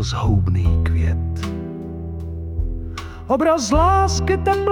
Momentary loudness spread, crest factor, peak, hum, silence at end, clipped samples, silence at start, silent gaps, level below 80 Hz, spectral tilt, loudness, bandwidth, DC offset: 14 LU; 14 dB; -4 dBFS; none; 0 s; under 0.1%; 0 s; none; -28 dBFS; -6 dB/octave; -20 LUFS; 11.5 kHz; under 0.1%